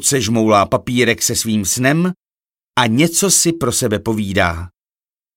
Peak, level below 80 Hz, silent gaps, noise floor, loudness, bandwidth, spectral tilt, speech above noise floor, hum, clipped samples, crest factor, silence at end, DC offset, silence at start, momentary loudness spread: 0 dBFS; -44 dBFS; none; under -90 dBFS; -15 LUFS; 17 kHz; -3.5 dB/octave; over 75 dB; none; under 0.1%; 16 dB; 0.7 s; under 0.1%; 0 s; 8 LU